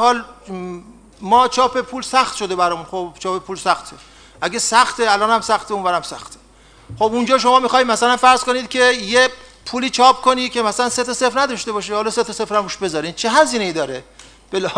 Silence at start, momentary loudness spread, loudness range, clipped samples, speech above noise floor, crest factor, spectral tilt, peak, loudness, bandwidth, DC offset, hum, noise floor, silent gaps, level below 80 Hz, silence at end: 0 s; 14 LU; 4 LU; under 0.1%; 28 dB; 18 dB; -2.5 dB/octave; 0 dBFS; -17 LUFS; 11 kHz; under 0.1%; none; -45 dBFS; none; -52 dBFS; 0 s